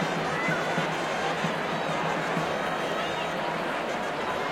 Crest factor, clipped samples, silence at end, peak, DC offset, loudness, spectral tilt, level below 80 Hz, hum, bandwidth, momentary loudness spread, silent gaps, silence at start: 16 dB; under 0.1%; 0 s; -14 dBFS; under 0.1%; -28 LUFS; -4.5 dB/octave; -62 dBFS; none; 16 kHz; 3 LU; none; 0 s